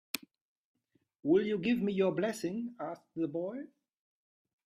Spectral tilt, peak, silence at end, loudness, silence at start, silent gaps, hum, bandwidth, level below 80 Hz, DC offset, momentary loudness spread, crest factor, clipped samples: -6 dB/octave; -14 dBFS; 1 s; -34 LUFS; 0.15 s; 0.41-0.74 s; none; 15 kHz; -74 dBFS; under 0.1%; 12 LU; 20 dB; under 0.1%